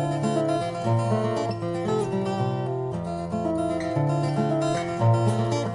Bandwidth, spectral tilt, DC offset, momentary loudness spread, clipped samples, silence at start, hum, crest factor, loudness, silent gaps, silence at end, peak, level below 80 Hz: 10.5 kHz; -7.5 dB/octave; under 0.1%; 6 LU; under 0.1%; 0 s; none; 14 dB; -25 LUFS; none; 0 s; -10 dBFS; -56 dBFS